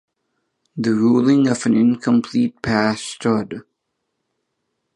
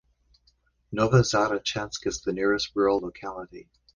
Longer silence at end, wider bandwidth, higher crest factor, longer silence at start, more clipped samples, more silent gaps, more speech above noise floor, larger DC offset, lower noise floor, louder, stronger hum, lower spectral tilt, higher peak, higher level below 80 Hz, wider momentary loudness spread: first, 1.35 s vs 0.35 s; about the same, 10.5 kHz vs 10 kHz; about the same, 16 dB vs 20 dB; second, 0.75 s vs 0.9 s; neither; neither; first, 58 dB vs 41 dB; neither; first, -75 dBFS vs -67 dBFS; first, -18 LUFS vs -25 LUFS; neither; about the same, -6 dB/octave vs -5 dB/octave; first, -2 dBFS vs -6 dBFS; about the same, -54 dBFS vs -52 dBFS; second, 9 LU vs 16 LU